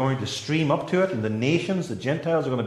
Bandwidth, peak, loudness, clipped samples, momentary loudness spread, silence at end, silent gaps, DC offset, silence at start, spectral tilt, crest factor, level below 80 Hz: 12.5 kHz; -8 dBFS; -25 LUFS; under 0.1%; 4 LU; 0 s; none; under 0.1%; 0 s; -6 dB/octave; 16 dB; -62 dBFS